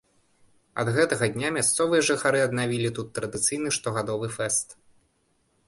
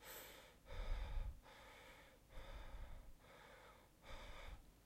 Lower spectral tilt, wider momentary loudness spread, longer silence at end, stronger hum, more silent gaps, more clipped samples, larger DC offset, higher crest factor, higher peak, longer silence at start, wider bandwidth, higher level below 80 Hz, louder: about the same, -3.5 dB/octave vs -4 dB/octave; second, 8 LU vs 13 LU; first, 0.95 s vs 0 s; neither; neither; neither; neither; about the same, 18 dB vs 18 dB; first, -10 dBFS vs -34 dBFS; first, 0.75 s vs 0 s; second, 12 kHz vs 16 kHz; second, -62 dBFS vs -54 dBFS; first, -25 LUFS vs -58 LUFS